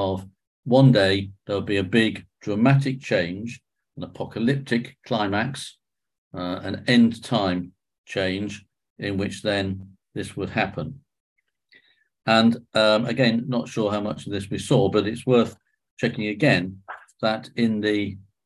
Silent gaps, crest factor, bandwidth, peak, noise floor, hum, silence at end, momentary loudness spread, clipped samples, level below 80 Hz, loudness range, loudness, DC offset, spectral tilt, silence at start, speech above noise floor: 0.47-0.63 s, 6.18-6.31 s, 7.98-8.04 s, 8.90-8.96 s, 11.20-11.36 s, 15.91-15.97 s; 20 dB; 12 kHz; -4 dBFS; -59 dBFS; none; 0.25 s; 16 LU; under 0.1%; -52 dBFS; 7 LU; -23 LUFS; under 0.1%; -6.5 dB/octave; 0 s; 37 dB